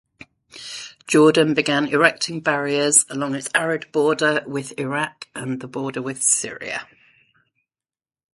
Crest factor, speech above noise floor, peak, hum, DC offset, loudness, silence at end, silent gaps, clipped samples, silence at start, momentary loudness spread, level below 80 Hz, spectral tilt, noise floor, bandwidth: 22 dB; over 70 dB; 0 dBFS; none; under 0.1%; -20 LUFS; 1.5 s; none; under 0.1%; 0.55 s; 15 LU; -66 dBFS; -3 dB/octave; under -90 dBFS; 11.5 kHz